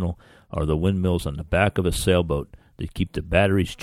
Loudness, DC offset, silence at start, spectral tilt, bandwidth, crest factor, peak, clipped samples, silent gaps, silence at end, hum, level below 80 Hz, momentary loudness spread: -23 LUFS; under 0.1%; 0 s; -6 dB/octave; 15.5 kHz; 18 dB; -4 dBFS; under 0.1%; none; 0 s; none; -36 dBFS; 14 LU